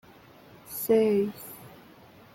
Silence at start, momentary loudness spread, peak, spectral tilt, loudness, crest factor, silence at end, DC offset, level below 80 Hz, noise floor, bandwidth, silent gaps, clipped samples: 0.65 s; 20 LU; -12 dBFS; -5.5 dB/octave; -26 LUFS; 18 dB; 0.65 s; under 0.1%; -68 dBFS; -53 dBFS; 17 kHz; none; under 0.1%